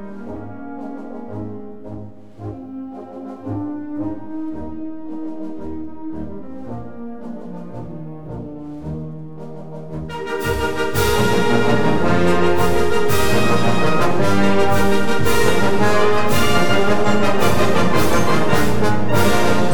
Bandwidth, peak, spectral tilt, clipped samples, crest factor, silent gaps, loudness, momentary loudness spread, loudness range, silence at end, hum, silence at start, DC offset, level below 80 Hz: over 20 kHz; 0 dBFS; -5.5 dB/octave; under 0.1%; 16 dB; none; -18 LUFS; 16 LU; 15 LU; 0 s; none; 0 s; under 0.1%; -38 dBFS